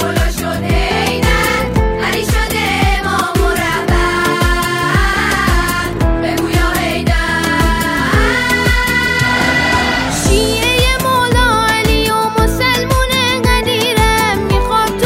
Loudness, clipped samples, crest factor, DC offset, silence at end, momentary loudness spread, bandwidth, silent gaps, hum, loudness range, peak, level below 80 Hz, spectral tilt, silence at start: -13 LUFS; under 0.1%; 12 dB; under 0.1%; 0 s; 3 LU; 16.5 kHz; none; none; 2 LU; 0 dBFS; -20 dBFS; -4 dB/octave; 0 s